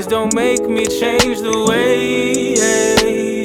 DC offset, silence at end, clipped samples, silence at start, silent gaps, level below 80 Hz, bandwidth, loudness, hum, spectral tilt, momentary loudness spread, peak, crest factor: under 0.1%; 0 s; under 0.1%; 0 s; none; -40 dBFS; 18 kHz; -14 LUFS; none; -3 dB/octave; 3 LU; 0 dBFS; 14 dB